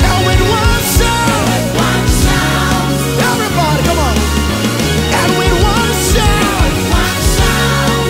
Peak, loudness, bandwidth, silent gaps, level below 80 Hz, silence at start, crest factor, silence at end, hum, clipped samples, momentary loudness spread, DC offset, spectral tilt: 0 dBFS; -12 LUFS; 16.5 kHz; none; -18 dBFS; 0 s; 12 dB; 0 s; none; under 0.1%; 2 LU; under 0.1%; -4.5 dB/octave